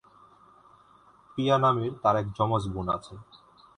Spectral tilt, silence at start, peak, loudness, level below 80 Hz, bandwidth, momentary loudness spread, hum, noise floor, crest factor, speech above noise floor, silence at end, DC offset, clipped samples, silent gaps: -7 dB/octave; 1.35 s; -8 dBFS; -27 LUFS; -54 dBFS; 10.5 kHz; 16 LU; none; -58 dBFS; 20 dB; 31 dB; 0.55 s; under 0.1%; under 0.1%; none